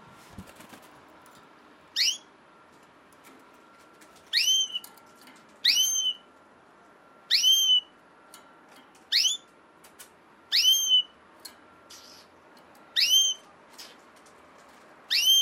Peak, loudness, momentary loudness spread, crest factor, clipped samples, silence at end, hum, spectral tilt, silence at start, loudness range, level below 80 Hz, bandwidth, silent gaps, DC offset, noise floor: -10 dBFS; -22 LUFS; 17 LU; 20 dB; under 0.1%; 0 s; none; 3 dB/octave; 0.4 s; 9 LU; -74 dBFS; 16.5 kHz; none; under 0.1%; -56 dBFS